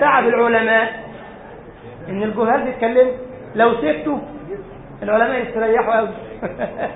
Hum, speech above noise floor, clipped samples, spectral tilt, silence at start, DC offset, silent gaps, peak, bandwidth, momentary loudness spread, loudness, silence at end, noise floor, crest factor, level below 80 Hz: none; 20 dB; under 0.1%; -10.5 dB/octave; 0 s; under 0.1%; none; -2 dBFS; 4 kHz; 21 LU; -18 LUFS; 0 s; -38 dBFS; 16 dB; -48 dBFS